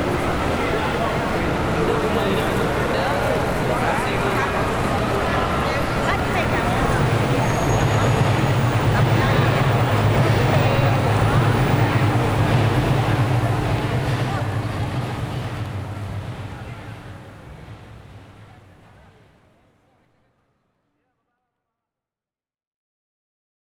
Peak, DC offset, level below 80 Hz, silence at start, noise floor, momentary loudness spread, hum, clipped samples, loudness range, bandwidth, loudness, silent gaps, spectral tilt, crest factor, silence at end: -6 dBFS; under 0.1%; -34 dBFS; 0 s; under -90 dBFS; 12 LU; none; under 0.1%; 13 LU; over 20 kHz; -20 LUFS; none; -6.5 dB/octave; 16 dB; 5.3 s